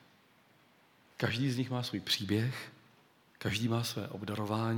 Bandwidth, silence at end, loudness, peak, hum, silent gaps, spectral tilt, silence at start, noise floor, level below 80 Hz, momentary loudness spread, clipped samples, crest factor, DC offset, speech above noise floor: 18.5 kHz; 0 s; -35 LUFS; -14 dBFS; none; none; -5 dB/octave; 1.2 s; -65 dBFS; -72 dBFS; 9 LU; under 0.1%; 22 dB; under 0.1%; 32 dB